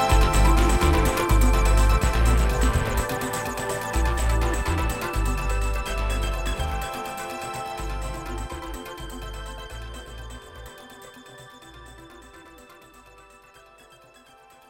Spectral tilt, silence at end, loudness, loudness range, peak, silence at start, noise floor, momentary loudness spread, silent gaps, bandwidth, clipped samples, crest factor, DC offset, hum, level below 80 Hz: -5 dB/octave; 1.95 s; -25 LUFS; 22 LU; -6 dBFS; 0 s; -52 dBFS; 23 LU; none; 16.5 kHz; under 0.1%; 18 dB; under 0.1%; none; -26 dBFS